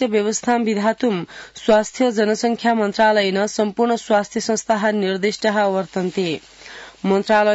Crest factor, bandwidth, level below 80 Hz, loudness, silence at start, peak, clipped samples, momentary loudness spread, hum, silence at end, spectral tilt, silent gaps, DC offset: 14 dB; 8 kHz; -60 dBFS; -19 LUFS; 0 s; -4 dBFS; under 0.1%; 9 LU; none; 0 s; -4.5 dB/octave; none; under 0.1%